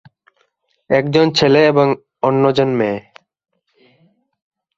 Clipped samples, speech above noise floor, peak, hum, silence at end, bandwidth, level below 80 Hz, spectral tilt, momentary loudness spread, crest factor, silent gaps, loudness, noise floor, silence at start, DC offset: under 0.1%; 51 dB; -2 dBFS; none; 1.75 s; 7.6 kHz; -56 dBFS; -6 dB/octave; 8 LU; 16 dB; none; -15 LUFS; -64 dBFS; 0.9 s; under 0.1%